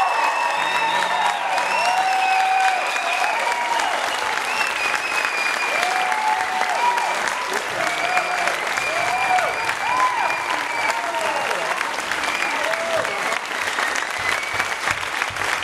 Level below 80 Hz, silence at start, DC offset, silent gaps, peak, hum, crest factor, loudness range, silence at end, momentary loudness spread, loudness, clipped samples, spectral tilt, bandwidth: -60 dBFS; 0 s; under 0.1%; none; -4 dBFS; none; 16 dB; 2 LU; 0 s; 4 LU; -20 LUFS; under 0.1%; -0.5 dB/octave; 16 kHz